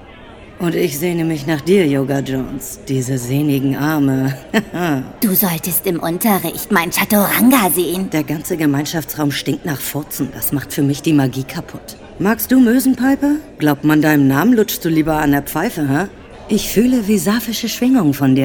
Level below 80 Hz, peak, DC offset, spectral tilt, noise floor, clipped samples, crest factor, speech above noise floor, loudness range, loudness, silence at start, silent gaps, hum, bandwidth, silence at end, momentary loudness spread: -42 dBFS; 0 dBFS; under 0.1%; -5 dB/octave; -37 dBFS; under 0.1%; 16 dB; 22 dB; 4 LU; -16 LUFS; 0 s; none; none; over 20 kHz; 0 s; 9 LU